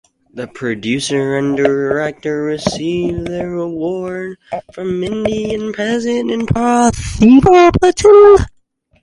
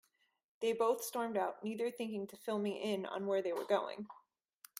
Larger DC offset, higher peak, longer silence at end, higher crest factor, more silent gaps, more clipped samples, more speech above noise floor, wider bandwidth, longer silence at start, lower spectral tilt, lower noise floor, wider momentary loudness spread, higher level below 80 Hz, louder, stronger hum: neither; first, 0 dBFS vs -20 dBFS; about the same, 0.55 s vs 0.6 s; second, 14 dB vs 20 dB; neither; neither; first, 43 dB vs 28 dB; second, 11.5 kHz vs 16 kHz; second, 0.35 s vs 0.6 s; first, -6 dB/octave vs -4.5 dB/octave; second, -56 dBFS vs -65 dBFS; first, 17 LU vs 8 LU; first, -34 dBFS vs -86 dBFS; first, -13 LUFS vs -38 LUFS; neither